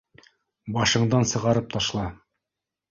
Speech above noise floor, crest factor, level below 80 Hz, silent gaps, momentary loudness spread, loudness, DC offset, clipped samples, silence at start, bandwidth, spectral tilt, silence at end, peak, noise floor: 63 dB; 18 dB; -50 dBFS; none; 12 LU; -23 LUFS; under 0.1%; under 0.1%; 0.65 s; 7.6 kHz; -4.5 dB/octave; 0.75 s; -8 dBFS; -87 dBFS